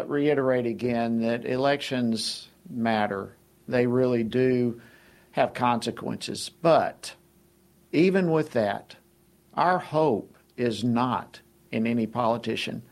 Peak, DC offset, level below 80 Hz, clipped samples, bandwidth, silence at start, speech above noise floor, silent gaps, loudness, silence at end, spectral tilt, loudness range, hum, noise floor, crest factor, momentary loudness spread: -8 dBFS; under 0.1%; -64 dBFS; under 0.1%; 14 kHz; 0 s; 35 dB; none; -26 LUFS; 0.1 s; -6 dB/octave; 2 LU; none; -61 dBFS; 18 dB; 11 LU